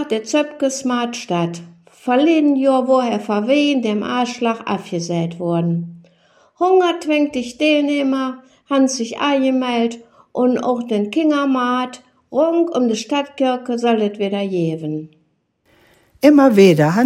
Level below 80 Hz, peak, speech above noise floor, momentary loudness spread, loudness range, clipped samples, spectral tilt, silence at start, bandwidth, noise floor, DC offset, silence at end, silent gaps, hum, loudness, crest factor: -66 dBFS; 0 dBFS; 47 dB; 9 LU; 3 LU; under 0.1%; -5.5 dB/octave; 0 s; 15.5 kHz; -63 dBFS; under 0.1%; 0 s; none; none; -17 LUFS; 18 dB